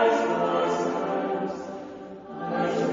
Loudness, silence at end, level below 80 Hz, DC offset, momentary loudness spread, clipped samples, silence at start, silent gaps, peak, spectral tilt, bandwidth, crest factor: -27 LUFS; 0 s; -66 dBFS; under 0.1%; 15 LU; under 0.1%; 0 s; none; -10 dBFS; -5.5 dB/octave; 7.6 kHz; 16 dB